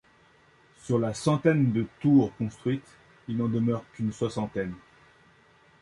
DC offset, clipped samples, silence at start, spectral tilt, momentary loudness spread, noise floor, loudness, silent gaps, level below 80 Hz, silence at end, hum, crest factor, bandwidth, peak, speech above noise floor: under 0.1%; under 0.1%; 0.85 s; -7.5 dB/octave; 12 LU; -60 dBFS; -27 LUFS; none; -60 dBFS; 1.05 s; none; 18 dB; 11.5 kHz; -10 dBFS; 34 dB